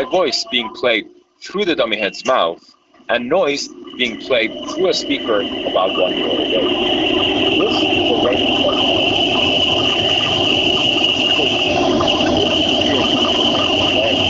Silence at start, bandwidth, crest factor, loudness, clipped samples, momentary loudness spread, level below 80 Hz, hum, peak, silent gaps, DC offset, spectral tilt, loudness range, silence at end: 0 s; 8 kHz; 14 dB; -15 LUFS; under 0.1%; 6 LU; -46 dBFS; none; -2 dBFS; none; under 0.1%; -1 dB/octave; 5 LU; 0 s